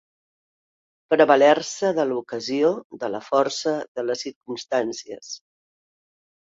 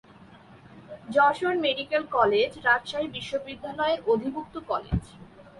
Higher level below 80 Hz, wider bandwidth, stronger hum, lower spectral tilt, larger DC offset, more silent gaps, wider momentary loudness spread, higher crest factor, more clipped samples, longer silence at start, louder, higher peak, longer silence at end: second, -72 dBFS vs -48 dBFS; second, 7.8 kHz vs 11.5 kHz; neither; second, -3.5 dB/octave vs -5.5 dB/octave; neither; first, 2.84-2.90 s, 3.88-3.95 s, 4.36-4.41 s vs none; first, 18 LU vs 11 LU; about the same, 22 dB vs 18 dB; neither; first, 1.1 s vs 0.3 s; first, -22 LUFS vs -26 LUFS; first, -2 dBFS vs -8 dBFS; first, 1.1 s vs 0.1 s